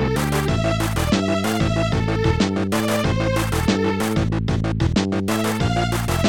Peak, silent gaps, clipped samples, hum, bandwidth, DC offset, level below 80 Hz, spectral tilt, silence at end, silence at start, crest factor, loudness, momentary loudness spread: -6 dBFS; none; under 0.1%; none; 18 kHz; 0.7%; -32 dBFS; -5.5 dB/octave; 0 s; 0 s; 14 dB; -20 LUFS; 2 LU